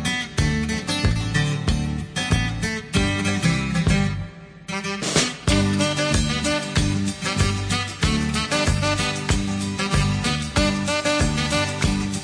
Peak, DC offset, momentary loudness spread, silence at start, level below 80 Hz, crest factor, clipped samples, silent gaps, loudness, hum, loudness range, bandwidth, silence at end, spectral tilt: -4 dBFS; under 0.1%; 5 LU; 0 s; -32 dBFS; 18 dB; under 0.1%; none; -22 LUFS; none; 1 LU; 10.5 kHz; 0 s; -4.5 dB/octave